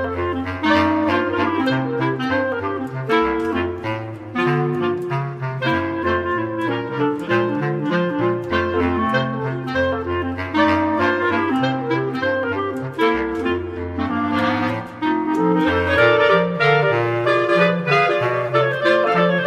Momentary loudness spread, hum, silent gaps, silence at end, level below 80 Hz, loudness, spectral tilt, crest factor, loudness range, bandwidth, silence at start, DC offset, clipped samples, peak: 8 LU; none; none; 0 s; -48 dBFS; -19 LUFS; -7 dB/octave; 16 dB; 5 LU; 12 kHz; 0 s; under 0.1%; under 0.1%; -2 dBFS